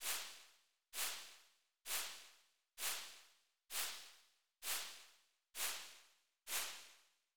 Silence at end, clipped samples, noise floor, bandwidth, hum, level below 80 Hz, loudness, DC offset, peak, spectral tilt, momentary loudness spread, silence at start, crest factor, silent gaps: 0 s; under 0.1%; -72 dBFS; over 20 kHz; none; -86 dBFS; -45 LUFS; under 0.1%; -28 dBFS; 2.5 dB/octave; 19 LU; 0 s; 20 dB; none